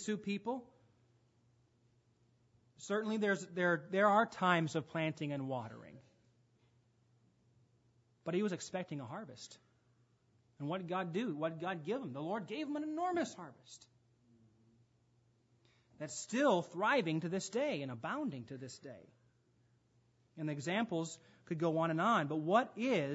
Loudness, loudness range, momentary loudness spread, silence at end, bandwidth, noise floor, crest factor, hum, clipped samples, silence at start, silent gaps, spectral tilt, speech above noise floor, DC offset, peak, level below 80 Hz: -37 LUFS; 10 LU; 17 LU; 0 s; 7.6 kHz; -73 dBFS; 22 dB; none; under 0.1%; 0 s; none; -4.5 dB/octave; 36 dB; under 0.1%; -16 dBFS; -84 dBFS